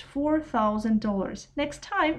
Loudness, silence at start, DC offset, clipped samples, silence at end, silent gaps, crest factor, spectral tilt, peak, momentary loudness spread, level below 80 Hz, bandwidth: -27 LUFS; 0 s; under 0.1%; under 0.1%; 0 s; none; 14 dB; -6 dB/octave; -12 dBFS; 7 LU; -50 dBFS; 10 kHz